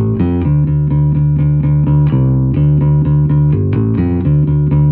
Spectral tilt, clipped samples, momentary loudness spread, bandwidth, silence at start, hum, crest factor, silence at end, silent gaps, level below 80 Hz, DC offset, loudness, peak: -14 dB/octave; under 0.1%; 3 LU; 3.2 kHz; 0 s; none; 8 dB; 0 s; none; -24 dBFS; under 0.1%; -12 LUFS; -4 dBFS